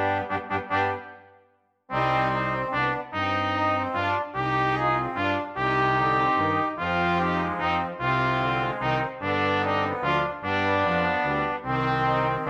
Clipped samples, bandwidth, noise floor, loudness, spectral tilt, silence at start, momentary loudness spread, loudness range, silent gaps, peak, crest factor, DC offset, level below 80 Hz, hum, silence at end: under 0.1%; 8.2 kHz; -64 dBFS; -25 LUFS; -7 dB/octave; 0 s; 4 LU; 2 LU; none; -10 dBFS; 14 dB; under 0.1%; -52 dBFS; none; 0 s